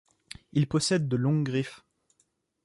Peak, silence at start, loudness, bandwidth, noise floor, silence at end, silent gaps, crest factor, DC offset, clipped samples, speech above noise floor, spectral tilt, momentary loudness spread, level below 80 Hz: -14 dBFS; 0.55 s; -28 LUFS; 11.5 kHz; -73 dBFS; 0.9 s; none; 16 dB; under 0.1%; under 0.1%; 46 dB; -5.5 dB/octave; 16 LU; -62 dBFS